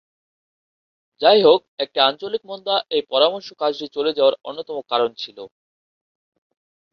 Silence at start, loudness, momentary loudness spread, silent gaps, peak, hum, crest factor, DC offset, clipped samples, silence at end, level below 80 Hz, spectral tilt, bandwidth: 1.2 s; -19 LUFS; 15 LU; 1.68-1.77 s; 0 dBFS; none; 20 dB; under 0.1%; under 0.1%; 1.45 s; -68 dBFS; -5 dB/octave; 6.4 kHz